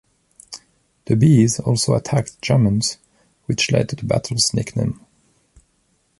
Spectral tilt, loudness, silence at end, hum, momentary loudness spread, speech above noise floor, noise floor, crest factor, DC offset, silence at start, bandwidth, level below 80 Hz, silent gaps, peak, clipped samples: -5 dB/octave; -18 LUFS; 1.25 s; none; 23 LU; 47 dB; -64 dBFS; 18 dB; under 0.1%; 0.5 s; 11.5 kHz; -46 dBFS; none; -2 dBFS; under 0.1%